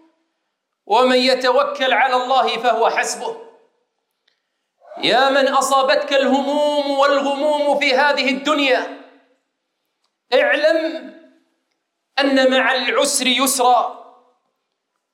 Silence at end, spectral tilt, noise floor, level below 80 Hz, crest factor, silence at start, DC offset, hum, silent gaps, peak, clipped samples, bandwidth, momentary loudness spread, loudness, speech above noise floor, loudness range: 1.1 s; -1 dB/octave; -75 dBFS; -78 dBFS; 16 dB; 0.9 s; under 0.1%; none; none; -2 dBFS; under 0.1%; 16.5 kHz; 6 LU; -16 LUFS; 59 dB; 4 LU